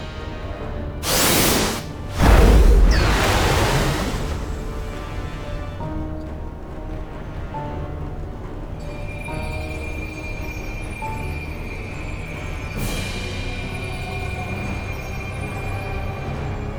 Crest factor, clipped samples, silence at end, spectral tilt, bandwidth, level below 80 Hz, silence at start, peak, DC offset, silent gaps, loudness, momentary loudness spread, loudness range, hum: 20 dB; under 0.1%; 0 s; -4.5 dB/octave; over 20 kHz; -24 dBFS; 0 s; -2 dBFS; under 0.1%; none; -23 LUFS; 16 LU; 14 LU; none